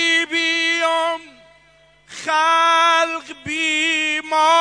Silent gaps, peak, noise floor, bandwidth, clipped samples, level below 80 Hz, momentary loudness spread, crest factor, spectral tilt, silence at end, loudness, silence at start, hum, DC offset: none; -4 dBFS; -53 dBFS; 10.5 kHz; under 0.1%; -64 dBFS; 13 LU; 14 dB; -1 dB/octave; 0 s; -17 LUFS; 0 s; 50 Hz at -65 dBFS; under 0.1%